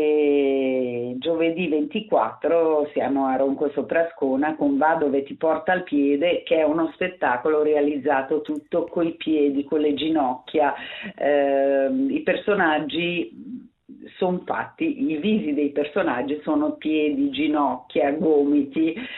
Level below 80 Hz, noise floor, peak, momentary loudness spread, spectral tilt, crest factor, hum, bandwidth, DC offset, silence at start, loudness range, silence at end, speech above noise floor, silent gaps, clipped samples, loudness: -64 dBFS; -45 dBFS; -6 dBFS; 6 LU; -9 dB/octave; 16 dB; none; 4.1 kHz; under 0.1%; 0 s; 3 LU; 0 s; 23 dB; none; under 0.1%; -22 LUFS